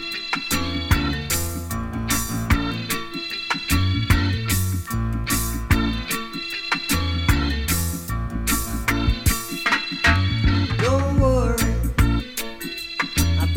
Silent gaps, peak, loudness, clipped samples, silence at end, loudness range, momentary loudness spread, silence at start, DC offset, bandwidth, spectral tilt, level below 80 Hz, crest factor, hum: none; -2 dBFS; -22 LUFS; under 0.1%; 0 s; 3 LU; 8 LU; 0 s; under 0.1%; 17 kHz; -4.5 dB/octave; -28 dBFS; 18 dB; none